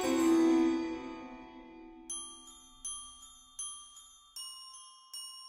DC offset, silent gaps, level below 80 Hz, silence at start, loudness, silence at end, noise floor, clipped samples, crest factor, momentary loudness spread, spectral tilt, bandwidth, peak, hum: under 0.1%; none; -66 dBFS; 0 s; -34 LUFS; 0 s; -57 dBFS; under 0.1%; 16 dB; 24 LU; -3 dB/octave; 16 kHz; -18 dBFS; none